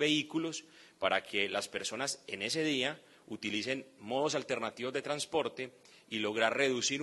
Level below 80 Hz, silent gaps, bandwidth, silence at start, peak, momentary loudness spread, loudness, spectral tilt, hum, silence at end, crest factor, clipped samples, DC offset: -76 dBFS; none; 12 kHz; 0 s; -14 dBFS; 10 LU; -34 LUFS; -2.5 dB/octave; none; 0 s; 22 dB; under 0.1%; under 0.1%